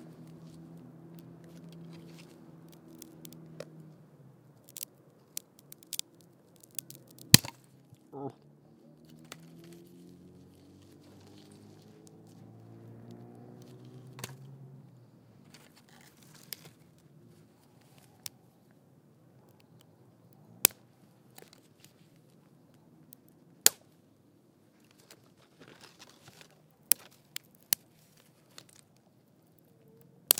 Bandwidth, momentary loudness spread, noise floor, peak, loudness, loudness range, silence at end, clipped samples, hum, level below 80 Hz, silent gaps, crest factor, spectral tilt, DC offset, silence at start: 18 kHz; 30 LU; -64 dBFS; 0 dBFS; -30 LUFS; 24 LU; 6.7 s; under 0.1%; none; -70 dBFS; none; 40 dB; -2 dB/octave; under 0.1%; 0.75 s